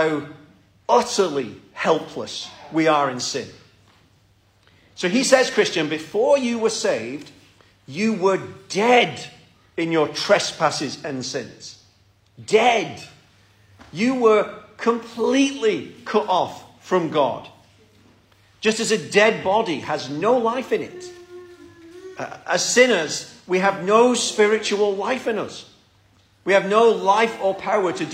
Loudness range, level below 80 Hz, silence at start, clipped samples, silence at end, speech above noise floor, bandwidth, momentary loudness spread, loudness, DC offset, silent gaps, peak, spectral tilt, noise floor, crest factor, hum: 5 LU; -66 dBFS; 0 s; under 0.1%; 0 s; 38 dB; 15.5 kHz; 17 LU; -20 LUFS; under 0.1%; none; -2 dBFS; -3.5 dB/octave; -58 dBFS; 20 dB; none